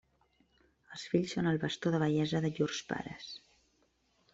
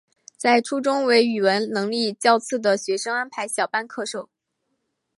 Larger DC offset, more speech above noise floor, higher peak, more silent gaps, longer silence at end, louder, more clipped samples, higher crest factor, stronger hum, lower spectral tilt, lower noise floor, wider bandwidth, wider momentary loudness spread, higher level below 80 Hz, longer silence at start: neither; second, 40 dB vs 54 dB; second, -16 dBFS vs -2 dBFS; neither; about the same, 0.95 s vs 0.95 s; second, -34 LUFS vs -22 LUFS; neither; about the same, 20 dB vs 20 dB; neither; first, -6 dB/octave vs -3 dB/octave; about the same, -74 dBFS vs -75 dBFS; second, 8 kHz vs 12 kHz; first, 16 LU vs 9 LU; first, -68 dBFS vs -78 dBFS; first, 0.9 s vs 0.4 s